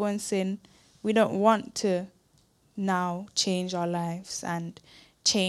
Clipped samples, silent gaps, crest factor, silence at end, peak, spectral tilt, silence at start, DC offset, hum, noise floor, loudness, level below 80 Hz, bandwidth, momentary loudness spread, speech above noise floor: under 0.1%; none; 20 dB; 0 s; -8 dBFS; -4 dB/octave; 0 s; under 0.1%; none; -65 dBFS; -28 LUFS; -68 dBFS; 14 kHz; 11 LU; 37 dB